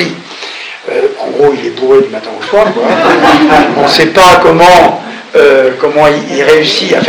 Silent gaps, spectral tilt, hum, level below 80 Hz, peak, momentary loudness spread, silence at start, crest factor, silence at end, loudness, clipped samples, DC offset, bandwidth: none; -4 dB/octave; none; -38 dBFS; 0 dBFS; 14 LU; 0 s; 8 dB; 0 s; -7 LUFS; 10%; under 0.1%; over 20 kHz